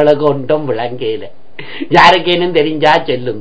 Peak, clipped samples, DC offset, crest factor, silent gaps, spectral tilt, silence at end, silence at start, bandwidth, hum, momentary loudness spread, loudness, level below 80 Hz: 0 dBFS; 1%; 6%; 12 dB; none; -5.5 dB/octave; 0 s; 0 s; 8 kHz; none; 18 LU; -12 LUFS; -46 dBFS